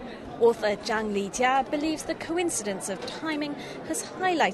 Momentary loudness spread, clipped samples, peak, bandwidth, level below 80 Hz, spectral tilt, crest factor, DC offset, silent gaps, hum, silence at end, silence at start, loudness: 9 LU; under 0.1%; -8 dBFS; 12.5 kHz; -58 dBFS; -3 dB/octave; 18 dB; under 0.1%; none; none; 0 s; 0 s; -28 LUFS